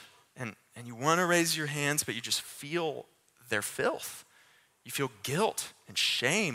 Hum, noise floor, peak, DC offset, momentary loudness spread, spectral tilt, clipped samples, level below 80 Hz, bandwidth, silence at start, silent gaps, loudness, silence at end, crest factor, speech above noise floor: none; -64 dBFS; -10 dBFS; under 0.1%; 16 LU; -3 dB/octave; under 0.1%; -72 dBFS; 16 kHz; 0 s; none; -30 LUFS; 0 s; 24 dB; 32 dB